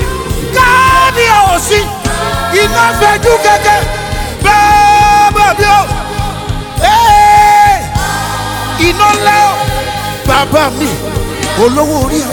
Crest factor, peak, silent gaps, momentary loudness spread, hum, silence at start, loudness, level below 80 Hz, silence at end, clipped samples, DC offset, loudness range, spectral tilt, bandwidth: 8 dB; 0 dBFS; none; 11 LU; none; 0 s; -9 LUFS; -22 dBFS; 0 s; 0.5%; under 0.1%; 3 LU; -3.5 dB/octave; 19.5 kHz